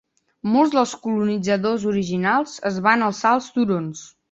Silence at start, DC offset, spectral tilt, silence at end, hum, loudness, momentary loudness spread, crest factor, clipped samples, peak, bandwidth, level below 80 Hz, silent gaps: 0.45 s; under 0.1%; -5.5 dB/octave; 0.25 s; none; -20 LUFS; 8 LU; 18 dB; under 0.1%; -2 dBFS; 8 kHz; -60 dBFS; none